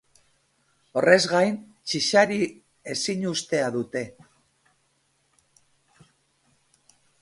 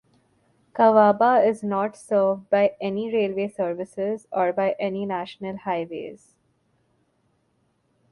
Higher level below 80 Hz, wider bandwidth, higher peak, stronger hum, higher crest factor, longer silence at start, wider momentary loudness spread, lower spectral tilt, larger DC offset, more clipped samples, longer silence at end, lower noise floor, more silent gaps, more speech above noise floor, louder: about the same, -70 dBFS vs -70 dBFS; about the same, 11.5 kHz vs 11.5 kHz; first, 0 dBFS vs -4 dBFS; neither; first, 26 dB vs 20 dB; first, 0.95 s vs 0.75 s; about the same, 14 LU vs 14 LU; second, -3.5 dB/octave vs -7 dB/octave; neither; neither; first, 3.1 s vs 1.95 s; about the same, -69 dBFS vs -68 dBFS; neither; about the same, 46 dB vs 46 dB; about the same, -23 LUFS vs -23 LUFS